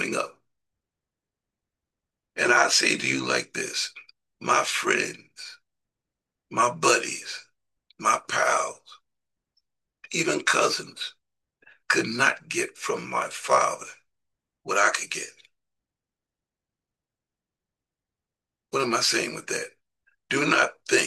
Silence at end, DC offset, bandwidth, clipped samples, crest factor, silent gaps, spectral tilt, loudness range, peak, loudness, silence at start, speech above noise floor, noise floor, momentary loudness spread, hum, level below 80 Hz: 0 s; under 0.1%; 12.5 kHz; under 0.1%; 22 dB; none; -2 dB/octave; 6 LU; -6 dBFS; -24 LUFS; 0 s; 64 dB; -90 dBFS; 15 LU; none; -76 dBFS